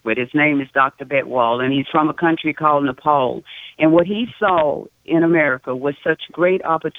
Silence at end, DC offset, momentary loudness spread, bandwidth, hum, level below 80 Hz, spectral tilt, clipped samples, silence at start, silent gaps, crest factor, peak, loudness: 0 s; under 0.1%; 7 LU; 4 kHz; none; -58 dBFS; -8 dB/octave; under 0.1%; 0.05 s; none; 16 dB; -2 dBFS; -18 LUFS